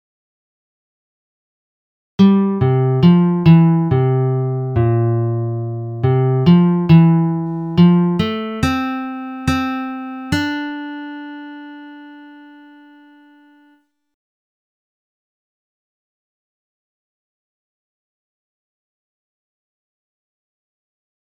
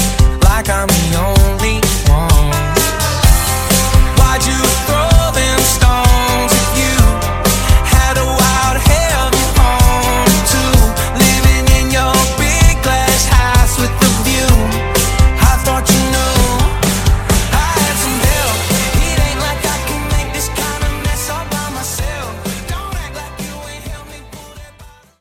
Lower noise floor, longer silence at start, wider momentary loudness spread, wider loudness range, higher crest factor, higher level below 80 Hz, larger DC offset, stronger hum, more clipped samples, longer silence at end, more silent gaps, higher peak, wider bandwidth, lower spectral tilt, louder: first, -56 dBFS vs -40 dBFS; first, 2.2 s vs 0 s; first, 18 LU vs 9 LU; first, 13 LU vs 8 LU; first, 18 dB vs 12 dB; second, -46 dBFS vs -16 dBFS; neither; neither; neither; first, 8.85 s vs 0.35 s; neither; about the same, 0 dBFS vs 0 dBFS; second, 7.8 kHz vs 17 kHz; first, -8.5 dB/octave vs -4 dB/octave; second, -15 LUFS vs -12 LUFS